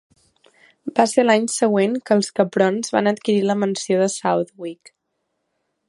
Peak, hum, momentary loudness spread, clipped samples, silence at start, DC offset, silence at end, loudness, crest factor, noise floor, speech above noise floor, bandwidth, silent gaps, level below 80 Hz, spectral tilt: 0 dBFS; none; 8 LU; under 0.1%; 0.85 s; under 0.1%; 1.15 s; -19 LUFS; 20 dB; -74 dBFS; 56 dB; 11.5 kHz; none; -70 dBFS; -4.5 dB/octave